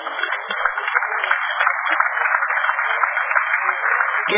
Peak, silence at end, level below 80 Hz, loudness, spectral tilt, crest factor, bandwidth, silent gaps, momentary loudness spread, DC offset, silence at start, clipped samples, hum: 0 dBFS; 0 s; -74 dBFS; -19 LUFS; -4 dB/octave; 20 dB; 3.8 kHz; none; 4 LU; under 0.1%; 0 s; under 0.1%; none